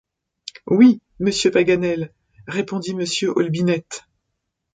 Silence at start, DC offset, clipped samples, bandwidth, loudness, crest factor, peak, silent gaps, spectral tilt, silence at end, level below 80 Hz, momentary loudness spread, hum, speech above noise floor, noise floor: 0.65 s; under 0.1%; under 0.1%; 9.4 kHz; -19 LUFS; 18 dB; -2 dBFS; none; -5.5 dB/octave; 0.75 s; -56 dBFS; 21 LU; none; 58 dB; -77 dBFS